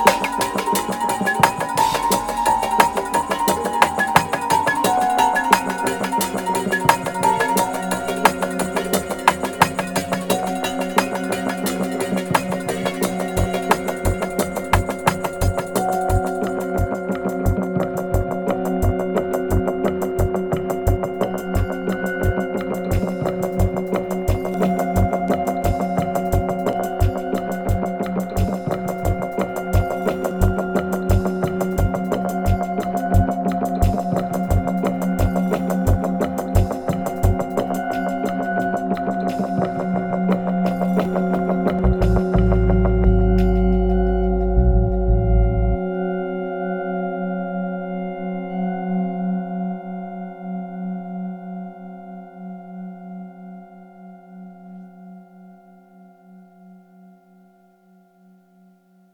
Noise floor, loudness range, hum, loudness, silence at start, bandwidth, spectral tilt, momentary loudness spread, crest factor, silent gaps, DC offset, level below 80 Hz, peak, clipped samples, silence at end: -54 dBFS; 8 LU; none; -21 LUFS; 0 s; over 20 kHz; -6 dB/octave; 9 LU; 20 dB; none; under 0.1%; -28 dBFS; 0 dBFS; under 0.1%; 2.35 s